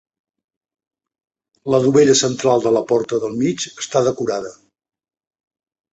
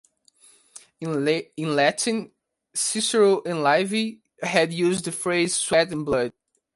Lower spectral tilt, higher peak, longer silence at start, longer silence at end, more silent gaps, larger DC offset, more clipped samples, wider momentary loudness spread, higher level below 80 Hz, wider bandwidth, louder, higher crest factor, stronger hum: about the same, -4.5 dB/octave vs -3.5 dB/octave; about the same, -2 dBFS vs -4 dBFS; first, 1.65 s vs 0.75 s; first, 1.4 s vs 0.45 s; neither; neither; neither; about the same, 12 LU vs 10 LU; about the same, -58 dBFS vs -62 dBFS; second, 8.2 kHz vs 12 kHz; first, -17 LUFS vs -23 LUFS; about the same, 18 dB vs 20 dB; neither